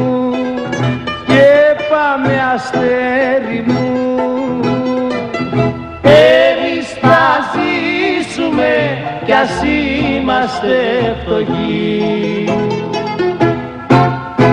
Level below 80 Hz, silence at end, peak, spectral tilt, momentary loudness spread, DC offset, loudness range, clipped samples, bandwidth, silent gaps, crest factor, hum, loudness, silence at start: -40 dBFS; 0 s; 0 dBFS; -6.5 dB/octave; 8 LU; under 0.1%; 4 LU; under 0.1%; 10.5 kHz; none; 12 dB; none; -13 LUFS; 0 s